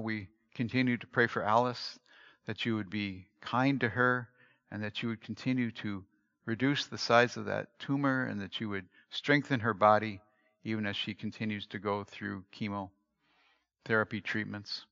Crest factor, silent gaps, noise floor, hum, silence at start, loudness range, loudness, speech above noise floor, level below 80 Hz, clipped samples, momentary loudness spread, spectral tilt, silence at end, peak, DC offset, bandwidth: 24 dB; none; -73 dBFS; none; 0 s; 6 LU; -33 LUFS; 40 dB; -78 dBFS; under 0.1%; 14 LU; -4 dB/octave; 0.05 s; -10 dBFS; under 0.1%; 7.4 kHz